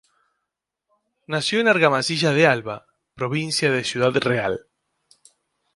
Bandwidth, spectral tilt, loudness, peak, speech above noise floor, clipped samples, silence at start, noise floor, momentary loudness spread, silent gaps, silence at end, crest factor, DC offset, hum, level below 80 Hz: 11.5 kHz; -4.5 dB/octave; -20 LUFS; -2 dBFS; 62 dB; under 0.1%; 1.3 s; -82 dBFS; 13 LU; none; 1.15 s; 22 dB; under 0.1%; none; -62 dBFS